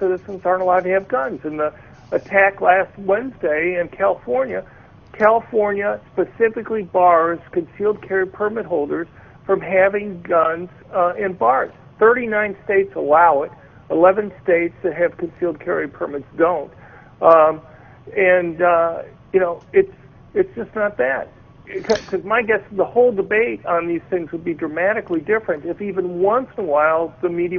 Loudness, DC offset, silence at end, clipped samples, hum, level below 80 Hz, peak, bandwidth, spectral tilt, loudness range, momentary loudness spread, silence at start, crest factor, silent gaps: -19 LUFS; under 0.1%; 0 s; under 0.1%; none; -54 dBFS; 0 dBFS; 6.8 kHz; -7 dB/octave; 4 LU; 11 LU; 0 s; 18 dB; none